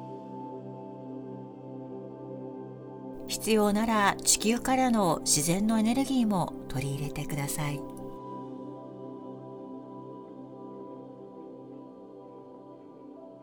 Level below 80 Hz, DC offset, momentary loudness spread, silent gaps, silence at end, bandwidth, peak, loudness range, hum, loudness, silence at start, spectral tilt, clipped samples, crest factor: -54 dBFS; under 0.1%; 22 LU; none; 0 s; over 20 kHz; -10 dBFS; 19 LU; none; -28 LUFS; 0 s; -4 dB/octave; under 0.1%; 22 dB